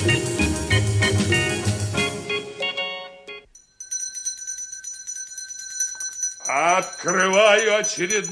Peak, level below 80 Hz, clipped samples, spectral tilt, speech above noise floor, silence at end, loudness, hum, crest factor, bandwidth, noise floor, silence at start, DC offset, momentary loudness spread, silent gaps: -4 dBFS; -44 dBFS; under 0.1%; -3 dB/octave; 26 dB; 0 s; -22 LUFS; none; 20 dB; 11 kHz; -44 dBFS; 0 s; under 0.1%; 14 LU; none